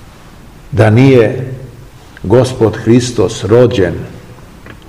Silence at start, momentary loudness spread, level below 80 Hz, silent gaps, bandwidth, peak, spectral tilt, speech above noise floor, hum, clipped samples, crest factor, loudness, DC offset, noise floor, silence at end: 0.7 s; 18 LU; -38 dBFS; none; 12.5 kHz; 0 dBFS; -7 dB/octave; 26 dB; none; 2%; 12 dB; -10 LUFS; under 0.1%; -35 dBFS; 0.15 s